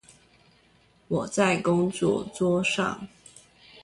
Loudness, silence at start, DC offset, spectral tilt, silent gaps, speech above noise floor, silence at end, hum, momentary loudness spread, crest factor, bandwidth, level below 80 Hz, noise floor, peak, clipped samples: -25 LUFS; 1.1 s; under 0.1%; -5 dB/octave; none; 36 dB; 0.05 s; none; 8 LU; 18 dB; 11.5 kHz; -60 dBFS; -61 dBFS; -10 dBFS; under 0.1%